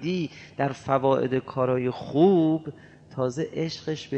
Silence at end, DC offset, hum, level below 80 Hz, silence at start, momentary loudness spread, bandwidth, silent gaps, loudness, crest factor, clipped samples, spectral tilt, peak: 0 s; under 0.1%; none; -62 dBFS; 0 s; 11 LU; 8.4 kHz; none; -25 LUFS; 18 dB; under 0.1%; -7.5 dB/octave; -6 dBFS